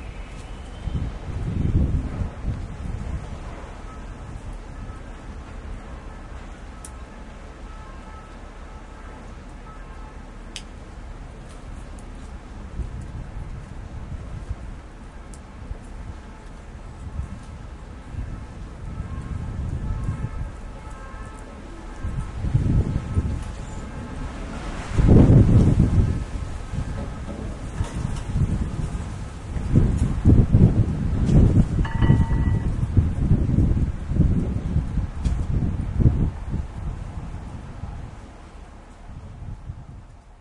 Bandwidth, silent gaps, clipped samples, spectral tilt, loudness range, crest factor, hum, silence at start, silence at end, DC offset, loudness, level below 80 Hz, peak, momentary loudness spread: 11 kHz; none; under 0.1%; -8.5 dB/octave; 20 LU; 22 dB; none; 0 s; 0.05 s; under 0.1%; -24 LUFS; -30 dBFS; -2 dBFS; 22 LU